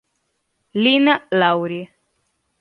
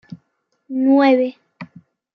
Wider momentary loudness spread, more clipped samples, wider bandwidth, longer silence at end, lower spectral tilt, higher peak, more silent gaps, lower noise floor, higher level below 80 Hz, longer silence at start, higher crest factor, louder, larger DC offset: second, 15 LU vs 25 LU; neither; about the same, 5.2 kHz vs 5.4 kHz; first, 0.75 s vs 0.5 s; about the same, -7 dB/octave vs -7.5 dB/octave; about the same, -2 dBFS vs -2 dBFS; neither; about the same, -71 dBFS vs -69 dBFS; about the same, -70 dBFS vs -74 dBFS; first, 0.75 s vs 0.1 s; about the same, 18 dB vs 16 dB; about the same, -17 LUFS vs -16 LUFS; neither